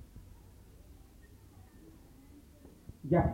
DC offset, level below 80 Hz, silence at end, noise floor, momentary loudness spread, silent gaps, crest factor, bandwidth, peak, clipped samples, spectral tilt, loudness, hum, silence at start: under 0.1%; -52 dBFS; 0 s; -57 dBFS; 19 LU; none; 24 dB; 16 kHz; -16 dBFS; under 0.1%; -9.5 dB/octave; -33 LUFS; none; 0.15 s